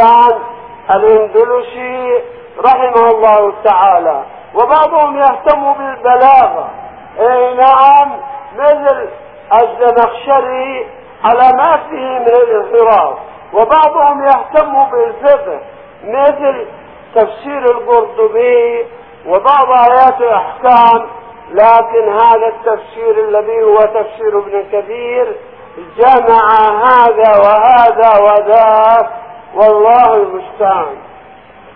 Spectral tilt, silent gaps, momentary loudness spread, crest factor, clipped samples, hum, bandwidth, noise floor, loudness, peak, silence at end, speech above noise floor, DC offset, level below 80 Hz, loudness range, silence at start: -7 dB/octave; none; 13 LU; 10 dB; 0.5%; none; 5.4 kHz; -37 dBFS; -9 LUFS; 0 dBFS; 0.75 s; 28 dB; 0.3%; -48 dBFS; 5 LU; 0 s